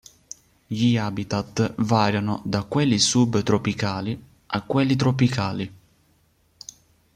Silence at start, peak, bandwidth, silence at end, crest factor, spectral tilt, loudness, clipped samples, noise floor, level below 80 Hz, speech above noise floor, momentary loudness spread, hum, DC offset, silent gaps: 0.7 s; -6 dBFS; 13 kHz; 1.4 s; 18 dB; -5 dB/octave; -23 LUFS; under 0.1%; -62 dBFS; -54 dBFS; 41 dB; 23 LU; none; under 0.1%; none